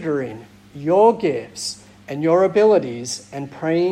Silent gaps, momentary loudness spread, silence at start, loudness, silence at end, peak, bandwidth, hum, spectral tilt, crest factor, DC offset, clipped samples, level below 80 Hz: none; 17 LU; 0 s; -19 LUFS; 0 s; -4 dBFS; 12.5 kHz; none; -5 dB/octave; 16 dB; under 0.1%; under 0.1%; -62 dBFS